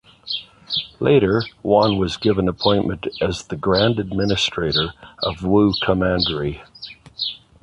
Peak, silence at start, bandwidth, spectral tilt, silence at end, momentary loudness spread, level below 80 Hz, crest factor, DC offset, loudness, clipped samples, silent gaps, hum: -2 dBFS; 0.25 s; 11 kHz; -6 dB/octave; 0.25 s; 11 LU; -40 dBFS; 18 dB; under 0.1%; -20 LUFS; under 0.1%; none; none